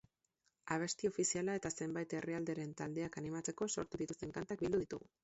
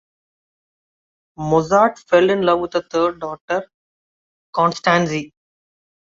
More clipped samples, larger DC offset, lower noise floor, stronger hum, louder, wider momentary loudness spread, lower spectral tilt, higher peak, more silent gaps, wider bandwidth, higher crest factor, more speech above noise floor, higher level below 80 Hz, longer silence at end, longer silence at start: neither; neither; second, -83 dBFS vs under -90 dBFS; neither; second, -41 LUFS vs -18 LUFS; second, 7 LU vs 12 LU; about the same, -5.5 dB/octave vs -5.5 dB/octave; second, -22 dBFS vs -2 dBFS; second, none vs 3.41-3.48 s, 3.74-4.53 s; about the same, 8 kHz vs 7.8 kHz; about the same, 20 dB vs 18 dB; second, 42 dB vs over 73 dB; second, -70 dBFS vs -56 dBFS; second, 0.25 s vs 0.85 s; second, 0.65 s vs 1.4 s